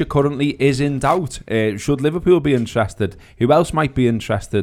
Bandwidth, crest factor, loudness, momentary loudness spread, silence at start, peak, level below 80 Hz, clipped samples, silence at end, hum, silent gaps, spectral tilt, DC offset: 14.5 kHz; 16 dB; -18 LUFS; 7 LU; 0 s; -2 dBFS; -40 dBFS; under 0.1%; 0 s; none; none; -6.5 dB/octave; under 0.1%